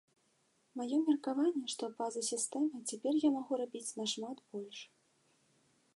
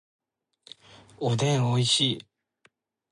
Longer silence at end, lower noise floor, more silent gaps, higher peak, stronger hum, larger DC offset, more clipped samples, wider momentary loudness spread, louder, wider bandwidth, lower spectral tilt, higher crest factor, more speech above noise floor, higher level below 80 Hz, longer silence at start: first, 1.1 s vs 0.9 s; first, -75 dBFS vs -66 dBFS; neither; second, -20 dBFS vs -10 dBFS; neither; neither; neither; first, 13 LU vs 10 LU; second, -36 LUFS vs -25 LUFS; about the same, 11.5 kHz vs 11.5 kHz; second, -3 dB/octave vs -4.5 dB/octave; about the same, 18 dB vs 18 dB; about the same, 39 dB vs 42 dB; second, under -90 dBFS vs -66 dBFS; second, 0.75 s vs 1.2 s